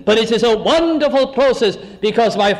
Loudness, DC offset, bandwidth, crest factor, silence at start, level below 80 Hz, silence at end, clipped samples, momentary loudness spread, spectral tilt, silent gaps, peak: -15 LUFS; under 0.1%; 12 kHz; 10 dB; 0 s; -44 dBFS; 0 s; under 0.1%; 5 LU; -4.5 dB/octave; none; -4 dBFS